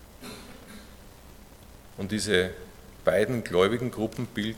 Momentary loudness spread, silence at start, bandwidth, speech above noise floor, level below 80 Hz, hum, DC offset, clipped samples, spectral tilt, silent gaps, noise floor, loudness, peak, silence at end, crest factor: 23 LU; 0 s; 17.5 kHz; 23 dB; -52 dBFS; none; under 0.1%; under 0.1%; -5 dB/octave; none; -49 dBFS; -27 LUFS; -6 dBFS; 0 s; 24 dB